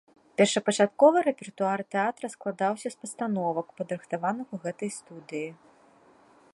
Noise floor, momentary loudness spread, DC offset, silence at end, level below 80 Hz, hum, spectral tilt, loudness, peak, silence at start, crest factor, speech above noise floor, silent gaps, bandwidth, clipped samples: -58 dBFS; 16 LU; under 0.1%; 1 s; -76 dBFS; none; -4.5 dB/octave; -28 LUFS; -8 dBFS; 0.4 s; 20 dB; 31 dB; none; 11.5 kHz; under 0.1%